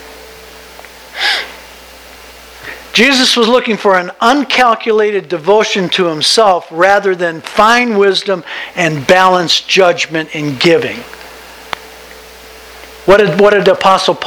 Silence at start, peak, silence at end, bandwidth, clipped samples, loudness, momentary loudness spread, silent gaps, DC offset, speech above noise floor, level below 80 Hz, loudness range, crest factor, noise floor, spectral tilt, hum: 0 s; 0 dBFS; 0 s; over 20 kHz; 0.5%; -10 LUFS; 17 LU; none; under 0.1%; 24 dB; -46 dBFS; 4 LU; 12 dB; -35 dBFS; -3.5 dB/octave; none